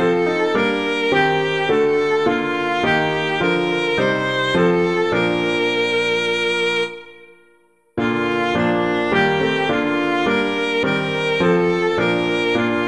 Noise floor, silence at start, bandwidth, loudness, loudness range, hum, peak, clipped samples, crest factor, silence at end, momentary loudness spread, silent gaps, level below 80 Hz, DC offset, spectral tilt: -57 dBFS; 0 s; 11 kHz; -18 LUFS; 2 LU; none; -4 dBFS; under 0.1%; 14 dB; 0 s; 3 LU; none; -52 dBFS; 0.3%; -5.5 dB/octave